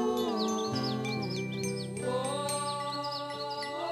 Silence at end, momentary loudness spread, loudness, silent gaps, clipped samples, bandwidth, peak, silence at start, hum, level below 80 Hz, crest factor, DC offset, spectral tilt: 0 s; 5 LU; -33 LUFS; none; under 0.1%; 15.5 kHz; -20 dBFS; 0 s; none; -68 dBFS; 14 dB; under 0.1%; -4.5 dB/octave